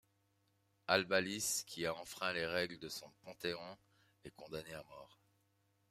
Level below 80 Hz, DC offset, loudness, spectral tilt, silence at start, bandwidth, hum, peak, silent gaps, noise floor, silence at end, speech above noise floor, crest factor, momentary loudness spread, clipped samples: -76 dBFS; under 0.1%; -39 LUFS; -2.5 dB/octave; 0.9 s; 15.5 kHz; none; -16 dBFS; none; -78 dBFS; 0.85 s; 37 dB; 28 dB; 21 LU; under 0.1%